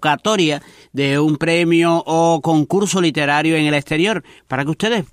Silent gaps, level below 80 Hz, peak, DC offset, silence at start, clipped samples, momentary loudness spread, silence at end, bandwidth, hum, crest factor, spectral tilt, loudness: none; -54 dBFS; -2 dBFS; under 0.1%; 0 s; under 0.1%; 7 LU; 0.1 s; 15 kHz; none; 14 dB; -5 dB/octave; -16 LUFS